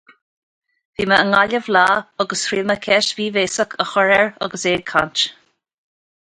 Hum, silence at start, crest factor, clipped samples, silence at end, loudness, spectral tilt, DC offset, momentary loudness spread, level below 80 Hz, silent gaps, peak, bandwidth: none; 1 s; 18 dB; under 0.1%; 0.9 s; -17 LUFS; -3 dB/octave; under 0.1%; 7 LU; -56 dBFS; none; 0 dBFS; 11.5 kHz